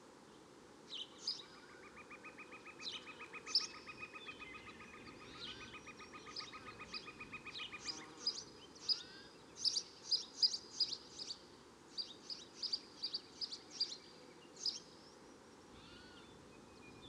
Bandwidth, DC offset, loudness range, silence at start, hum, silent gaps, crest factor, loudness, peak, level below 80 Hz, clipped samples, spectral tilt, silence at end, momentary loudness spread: 13 kHz; under 0.1%; 11 LU; 0 s; none; none; 26 dB; -43 LUFS; -22 dBFS; -76 dBFS; under 0.1%; -0.5 dB/octave; 0 s; 22 LU